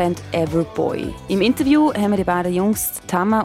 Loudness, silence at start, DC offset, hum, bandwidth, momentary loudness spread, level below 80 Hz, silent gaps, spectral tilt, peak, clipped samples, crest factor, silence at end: -19 LUFS; 0 s; under 0.1%; none; 16.5 kHz; 7 LU; -44 dBFS; none; -5.5 dB/octave; -4 dBFS; under 0.1%; 14 dB; 0 s